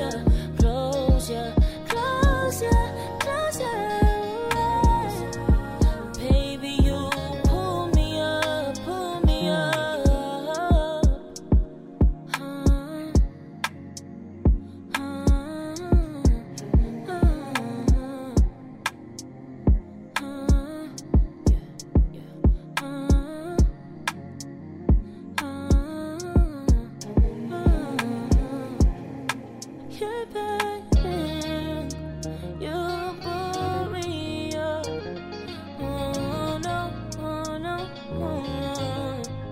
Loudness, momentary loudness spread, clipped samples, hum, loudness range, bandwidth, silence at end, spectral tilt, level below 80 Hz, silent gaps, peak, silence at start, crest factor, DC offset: -26 LUFS; 10 LU; under 0.1%; none; 6 LU; 15.5 kHz; 0 s; -6 dB/octave; -26 dBFS; none; -8 dBFS; 0 s; 16 dB; under 0.1%